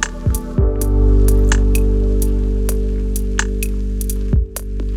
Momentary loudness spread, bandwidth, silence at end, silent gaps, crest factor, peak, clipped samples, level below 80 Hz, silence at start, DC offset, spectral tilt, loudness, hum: 8 LU; 16 kHz; 0 s; none; 14 dB; 0 dBFS; under 0.1%; -16 dBFS; 0 s; under 0.1%; -5.5 dB/octave; -18 LUFS; 50 Hz at -25 dBFS